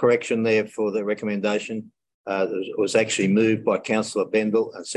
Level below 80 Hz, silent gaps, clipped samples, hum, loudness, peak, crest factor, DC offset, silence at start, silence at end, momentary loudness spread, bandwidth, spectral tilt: -68 dBFS; 2.14-2.24 s; under 0.1%; none; -23 LUFS; -6 dBFS; 16 dB; under 0.1%; 0 s; 0 s; 7 LU; 11.5 kHz; -5 dB/octave